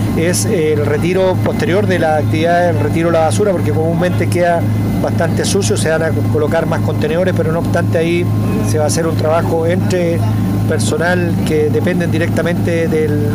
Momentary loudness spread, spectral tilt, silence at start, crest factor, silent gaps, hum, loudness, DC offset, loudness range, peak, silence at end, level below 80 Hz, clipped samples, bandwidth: 2 LU; -6 dB/octave; 0 s; 10 dB; none; none; -14 LUFS; 0.1%; 1 LU; -4 dBFS; 0 s; -34 dBFS; under 0.1%; 15.5 kHz